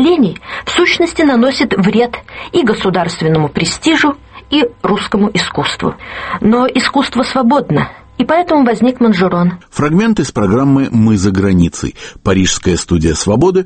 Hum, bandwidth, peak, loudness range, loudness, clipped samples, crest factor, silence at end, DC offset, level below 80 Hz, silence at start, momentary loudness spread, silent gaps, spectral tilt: none; 8.8 kHz; 0 dBFS; 2 LU; -12 LUFS; under 0.1%; 12 dB; 0 s; under 0.1%; -34 dBFS; 0 s; 6 LU; none; -5.5 dB/octave